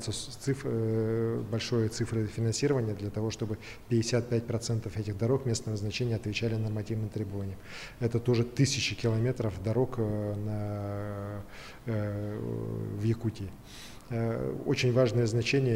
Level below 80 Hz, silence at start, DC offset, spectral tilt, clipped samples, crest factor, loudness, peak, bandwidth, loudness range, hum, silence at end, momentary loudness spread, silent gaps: -54 dBFS; 0 s; under 0.1%; -6 dB/octave; under 0.1%; 18 dB; -31 LUFS; -14 dBFS; 15 kHz; 5 LU; none; 0 s; 10 LU; none